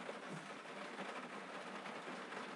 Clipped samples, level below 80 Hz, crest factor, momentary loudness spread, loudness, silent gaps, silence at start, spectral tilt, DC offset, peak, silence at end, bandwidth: under 0.1%; under -90 dBFS; 16 dB; 2 LU; -49 LUFS; none; 0 s; -4 dB/octave; under 0.1%; -32 dBFS; 0 s; 11.5 kHz